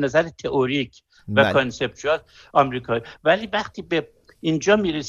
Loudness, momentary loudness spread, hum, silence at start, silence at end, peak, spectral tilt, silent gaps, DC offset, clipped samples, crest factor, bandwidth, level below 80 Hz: -22 LUFS; 7 LU; none; 0 s; 0 s; -4 dBFS; -5 dB/octave; none; under 0.1%; under 0.1%; 18 dB; 7.8 kHz; -52 dBFS